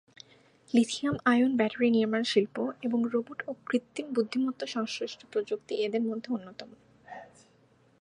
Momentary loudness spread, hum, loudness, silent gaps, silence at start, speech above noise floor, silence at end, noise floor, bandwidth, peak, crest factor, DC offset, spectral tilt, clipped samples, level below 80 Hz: 13 LU; none; -29 LUFS; none; 0.75 s; 35 dB; 0.75 s; -64 dBFS; 10.5 kHz; -10 dBFS; 20 dB; under 0.1%; -5 dB/octave; under 0.1%; -72 dBFS